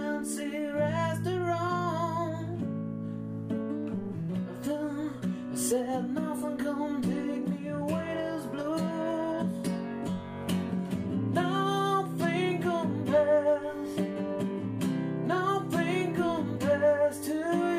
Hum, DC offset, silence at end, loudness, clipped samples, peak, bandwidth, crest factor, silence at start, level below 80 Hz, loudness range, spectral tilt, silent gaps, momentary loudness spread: none; under 0.1%; 0 s; -31 LUFS; under 0.1%; -14 dBFS; 15.5 kHz; 16 dB; 0 s; -66 dBFS; 5 LU; -6 dB/octave; none; 7 LU